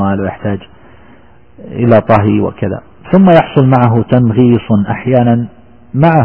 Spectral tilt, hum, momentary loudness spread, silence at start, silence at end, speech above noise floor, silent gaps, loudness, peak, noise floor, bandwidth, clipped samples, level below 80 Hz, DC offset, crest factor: -11 dB/octave; none; 12 LU; 0 s; 0 s; 33 dB; none; -11 LUFS; 0 dBFS; -42 dBFS; 4.5 kHz; 0.2%; -40 dBFS; 0.6%; 10 dB